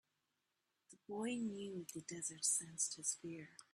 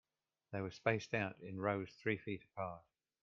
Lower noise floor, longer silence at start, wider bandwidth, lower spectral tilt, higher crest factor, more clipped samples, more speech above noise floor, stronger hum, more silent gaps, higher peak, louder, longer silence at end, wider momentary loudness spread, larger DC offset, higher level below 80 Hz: first, -87 dBFS vs -74 dBFS; first, 0.9 s vs 0.5 s; first, 14.5 kHz vs 7.4 kHz; second, -2.5 dB/octave vs -5 dB/octave; about the same, 22 dB vs 22 dB; neither; first, 43 dB vs 33 dB; neither; neither; second, -24 dBFS vs -20 dBFS; about the same, -42 LUFS vs -42 LUFS; second, 0.1 s vs 0.45 s; first, 13 LU vs 9 LU; neither; second, -86 dBFS vs -74 dBFS